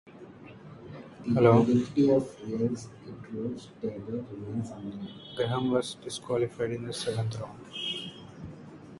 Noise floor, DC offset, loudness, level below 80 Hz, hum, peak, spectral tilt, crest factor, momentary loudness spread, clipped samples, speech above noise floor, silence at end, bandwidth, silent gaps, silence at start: -48 dBFS; under 0.1%; -29 LUFS; -62 dBFS; none; -8 dBFS; -6.5 dB/octave; 22 dB; 22 LU; under 0.1%; 19 dB; 0 s; 11.5 kHz; none; 0.05 s